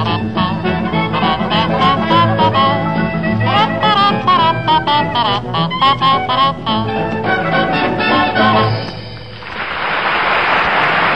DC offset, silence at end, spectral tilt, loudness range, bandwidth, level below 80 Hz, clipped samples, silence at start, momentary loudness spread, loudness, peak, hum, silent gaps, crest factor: 1%; 0 s; -7 dB/octave; 2 LU; 9.6 kHz; -40 dBFS; under 0.1%; 0 s; 6 LU; -14 LUFS; -2 dBFS; none; none; 12 dB